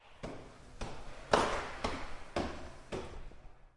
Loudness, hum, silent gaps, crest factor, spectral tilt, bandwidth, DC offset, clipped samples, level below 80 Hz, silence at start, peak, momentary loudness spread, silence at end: -38 LUFS; none; none; 28 dB; -4 dB/octave; 11.5 kHz; under 0.1%; under 0.1%; -50 dBFS; 0 s; -10 dBFS; 20 LU; 0.1 s